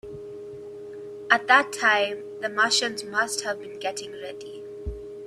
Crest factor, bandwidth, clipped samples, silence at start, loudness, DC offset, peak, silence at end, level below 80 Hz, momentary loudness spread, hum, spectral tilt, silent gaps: 24 dB; 14.5 kHz; under 0.1%; 0.05 s; -23 LUFS; under 0.1%; -4 dBFS; 0 s; -50 dBFS; 20 LU; none; -1.5 dB/octave; none